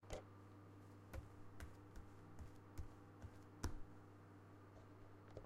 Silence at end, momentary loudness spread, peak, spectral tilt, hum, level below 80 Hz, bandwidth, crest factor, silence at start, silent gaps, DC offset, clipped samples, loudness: 0 s; 11 LU; -30 dBFS; -5.5 dB/octave; none; -62 dBFS; 15.5 kHz; 26 dB; 0 s; none; under 0.1%; under 0.1%; -59 LUFS